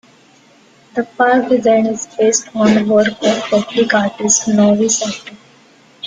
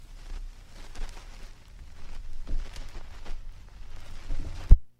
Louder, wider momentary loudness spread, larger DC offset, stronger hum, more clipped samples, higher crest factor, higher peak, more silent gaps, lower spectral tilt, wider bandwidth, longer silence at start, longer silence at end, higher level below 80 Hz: first, -14 LUFS vs -36 LUFS; about the same, 9 LU vs 10 LU; neither; neither; neither; second, 14 dB vs 24 dB; about the same, 0 dBFS vs -2 dBFS; neither; second, -3.5 dB/octave vs -6 dB/octave; first, 9.6 kHz vs 7.4 kHz; first, 0.95 s vs 0 s; about the same, 0 s vs 0.1 s; second, -56 dBFS vs -28 dBFS